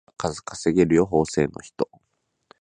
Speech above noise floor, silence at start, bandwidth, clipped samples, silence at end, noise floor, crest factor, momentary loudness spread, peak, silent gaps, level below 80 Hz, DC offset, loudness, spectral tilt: 52 dB; 0.2 s; 10 kHz; under 0.1%; 0.75 s; -74 dBFS; 18 dB; 12 LU; -6 dBFS; none; -48 dBFS; under 0.1%; -23 LUFS; -6 dB/octave